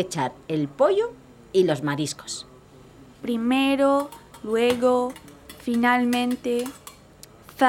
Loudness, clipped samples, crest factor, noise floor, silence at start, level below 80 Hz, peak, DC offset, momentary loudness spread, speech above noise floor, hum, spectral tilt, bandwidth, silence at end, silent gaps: -23 LUFS; under 0.1%; 20 dB; -49 dBFS; 0 s; -60 dBFS; -4 dBFS; under 0.1%; 16 LU; 26 dB; none; -5 dB/octave; 17.5 kHz; 0 s; none